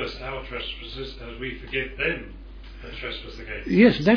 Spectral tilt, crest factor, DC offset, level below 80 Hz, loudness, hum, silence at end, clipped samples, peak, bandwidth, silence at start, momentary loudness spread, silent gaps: -7 dB/octave; 20 dB; under 0.1%; -40 dBFS; -26 LUFS; none; 0 s; under 0.1%; -4 dBFS; 5.4 kHz; 0 s; 22 LU; none